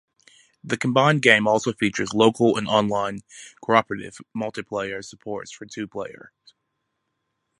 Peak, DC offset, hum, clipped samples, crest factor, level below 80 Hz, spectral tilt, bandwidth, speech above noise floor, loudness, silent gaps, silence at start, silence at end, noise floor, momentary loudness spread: 0 dBFS; under 0.1%; none; under 0.1%; 24 dB; -62 dBFS; -5 dB/octave; 11.5 kHz; 54 dB; -21 LUFS; none; 0.65 s; 1.45 s; -77 dBFS; 18 LU